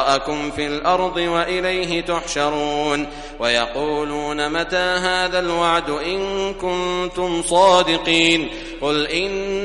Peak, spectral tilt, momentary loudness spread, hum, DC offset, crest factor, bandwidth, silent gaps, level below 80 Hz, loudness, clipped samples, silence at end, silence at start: -2 dBFS; -3.5 dB/octave; 8 LU; none; under 0.1%; 18 dB; 11.5 kHz; none; -40 dBFS; -19 LUFS; under 0.1%; 0 s; 0 s